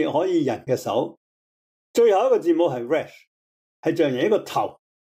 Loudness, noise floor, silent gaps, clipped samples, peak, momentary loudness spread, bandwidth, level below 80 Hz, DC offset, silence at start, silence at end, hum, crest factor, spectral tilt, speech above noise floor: -22 LUFS; under -90 dBFS; 1.17-1.94 s, 3.27-3.83 s; under 0.1%; -8 dBFS; 9 LU; 16 kHz; -72 dBFS; under 0.1%; 0 s; 0.3 s; none; 14 dB; -6 dB/octave; over 69 dB